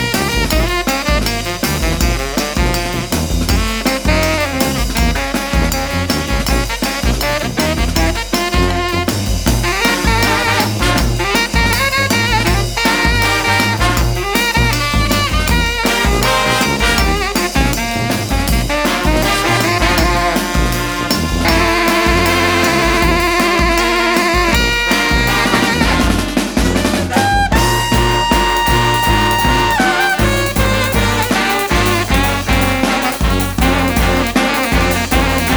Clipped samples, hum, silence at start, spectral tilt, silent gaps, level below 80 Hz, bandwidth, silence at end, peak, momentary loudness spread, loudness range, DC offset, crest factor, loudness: under 0.1%; none; 0 s; -4 dB/octave; none; -20 dBFS; over 20 kHz; 0 s; 0 dBFS; 4 LU; 3 LU; under 0.1%; 14 dB; -14 LUFS